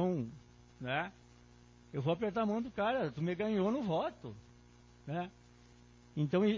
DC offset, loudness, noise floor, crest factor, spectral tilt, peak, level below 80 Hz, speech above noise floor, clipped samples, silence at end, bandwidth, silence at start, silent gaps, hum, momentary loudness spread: under 0.1%; -37 LUFS; -61 dBFS; 16 dB; -7.5 dB/octave; -20 dBFS; -66 dBFS; 26 dB; under 0.1%; 0 s; 7.4 kHz; 0 s; none; 60 Hz at -60 dBFS; 15 LU